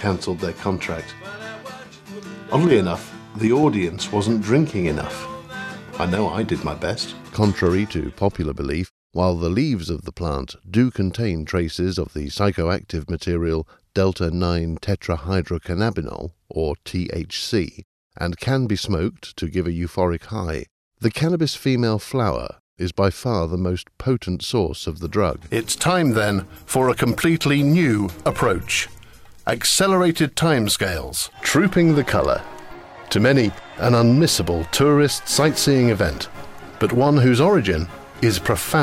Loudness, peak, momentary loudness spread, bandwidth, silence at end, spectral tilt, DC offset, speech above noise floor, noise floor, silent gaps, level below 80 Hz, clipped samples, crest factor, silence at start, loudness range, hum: -21 LUFS; -4 dBFS; 13 LU; 16 kHz; 0 s; -5 dB/octave; under 0.1%; 23 dB; -43 dBFS; 8.90-9.10 s, 17.84-18.10 s, 20.71-20.91 s, 22.60-22.77 s; -42 dBFS; under 0.1%; 16 dB; 0 s; 6 LU; none